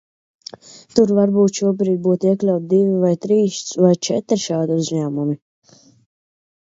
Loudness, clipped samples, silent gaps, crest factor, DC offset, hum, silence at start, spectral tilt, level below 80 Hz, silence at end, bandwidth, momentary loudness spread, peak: -18 LUFS; under 0.1%; none; 18 dB; under 0.1%; none; 0.7 s; -6.5 dB/octave; -64 dBFS; 1.4 s; 7.8 kHz; 9 LU; 0 dBFS